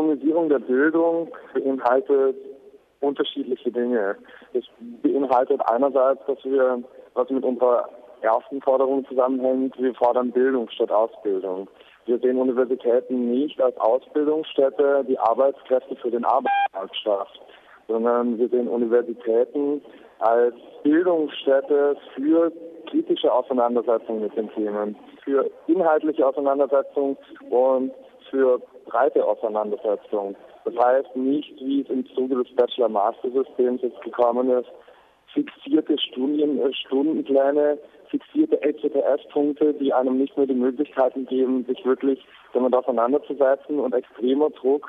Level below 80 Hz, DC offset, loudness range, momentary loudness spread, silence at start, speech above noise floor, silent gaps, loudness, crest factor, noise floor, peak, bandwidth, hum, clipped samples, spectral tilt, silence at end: -76 dBFS; under 0.1%; 2 LU; 8 LU; 0 s; 25 dB; none; -22 LUFS; 16 dB; -47 dBFS; -6 dBFS; 4 kHz; none; under 0.1%; -7.5 dB/octave; 0 s